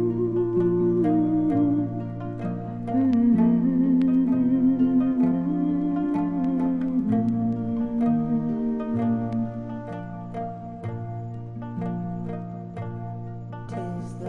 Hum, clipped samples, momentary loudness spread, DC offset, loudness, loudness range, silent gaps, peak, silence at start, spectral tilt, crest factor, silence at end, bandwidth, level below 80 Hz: none; under 0.1%; 14 LU; under 0.1%; -24 LUFS; 12 LU; none; -10 dBFS; 0 s; -10.5 dB/octave; 14 dB; 0 s; 3.7 kHz; -50 dBFS